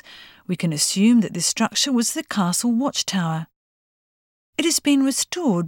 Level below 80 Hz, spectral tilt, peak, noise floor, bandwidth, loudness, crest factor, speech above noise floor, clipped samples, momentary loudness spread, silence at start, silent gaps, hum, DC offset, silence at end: -66 dBFS; -3.5 dB/octave; -6 dBFS; under -90 dBFS; 18 kHz; -20 LUFS; 16 dB; over 70 dB; under 0.1%; 11 LU; 0.1 s; 3.56-4.53 s; none; under 0.1%; 0 s